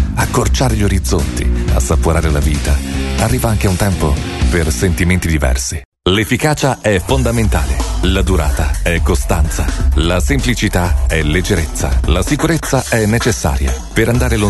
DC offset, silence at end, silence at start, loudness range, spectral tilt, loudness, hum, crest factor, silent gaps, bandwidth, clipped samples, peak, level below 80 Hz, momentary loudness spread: under 0.1%; 0 s; 0 s; 1 LU; -5 dB/octave; -15 LUFS; none; 12 dB; 5.85-5.92 s; 12.5 kHz; under 0.1%; 0 dBFS; -18 dBFS; 3 LU